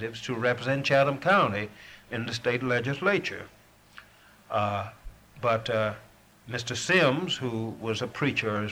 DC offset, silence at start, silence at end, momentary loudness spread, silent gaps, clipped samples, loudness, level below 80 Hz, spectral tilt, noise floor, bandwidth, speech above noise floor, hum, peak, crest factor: under 0.1%; 0 s; 0 s; 14 LU; none; under 0.1%; -27 LUFS; -58 dBFS; -5 dB/octave; -56 dBFS; over 20 kHz; 28 dB; none; -8 dBFS; 20 dB